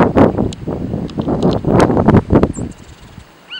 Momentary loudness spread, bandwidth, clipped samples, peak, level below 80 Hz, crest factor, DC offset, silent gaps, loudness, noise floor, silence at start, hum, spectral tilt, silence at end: 11 LU; 11.5 kHz; under 0.1%; 0 dBFS; -30 dBFS; 14 dB; under 0.1%; none; -14 LUFS; -38 dBFS; 0 s; none; -7.5 dB/octave; 0 s